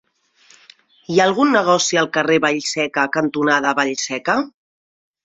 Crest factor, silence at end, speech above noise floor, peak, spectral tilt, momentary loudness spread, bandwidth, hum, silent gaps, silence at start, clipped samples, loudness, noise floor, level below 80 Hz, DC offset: 18 dB; 0.75 s; 37 dB; -2 dBFS; -3.5 dB/octave; 6 LU; 8.2 kHz; none; none; 1.1 s; under 0.1%; -17 LUFS; -54 dBFS; -64 dBFS; under 0.1%